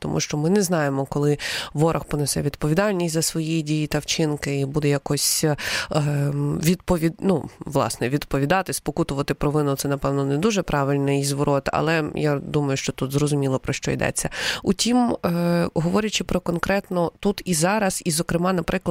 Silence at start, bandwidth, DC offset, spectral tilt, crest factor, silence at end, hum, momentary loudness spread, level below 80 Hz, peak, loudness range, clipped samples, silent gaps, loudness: 0 s; 16 kHz; under 0.1%; -5 dB/octave; 18 dB; 0 s; none; 4 LU; -44 dBFS; -4 dBFS; 1 LU; under 0.1%; none; -22 LUFS